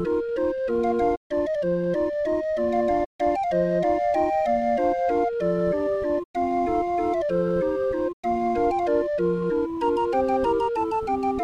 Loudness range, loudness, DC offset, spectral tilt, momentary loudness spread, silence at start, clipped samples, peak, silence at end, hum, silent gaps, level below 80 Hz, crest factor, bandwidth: 1 LU; -24 LUFS; under 0.1%; -8 dB/octave; 3 LU; 0 s; under 0.1%; -10 dBFS; 0 s; none; 1.17-1.30 s, 3.06-3.19 s, 6.25-6.34 s, 8.13-8.23 s; -48 dBFS; 12 dB; 9.4 kHz